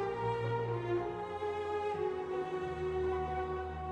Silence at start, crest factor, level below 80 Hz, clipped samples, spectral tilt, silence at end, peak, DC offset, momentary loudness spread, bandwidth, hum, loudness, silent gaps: 0 s; 12 dB; -52 dBFS; under 0.1%; -7.5 dB/octave; 0 s; -24 dBFS; under 0.1%; 3 LU; 9.2 kHz; none; -37 LUFS; none